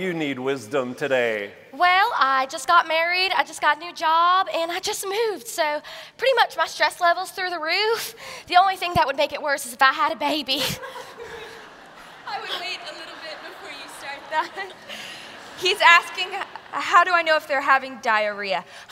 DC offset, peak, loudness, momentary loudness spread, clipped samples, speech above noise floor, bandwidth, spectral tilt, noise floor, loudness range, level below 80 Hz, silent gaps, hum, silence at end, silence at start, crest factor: under 0.1%; -2 dBFS; -21 LUFS; 18 LU; under 0.1%; 22 dB; 16 kHz; -2 dB/octave; -44 dBFS; 12 LU; -60 dBFS; none; none; 0.05 s; 0 s; 22 dB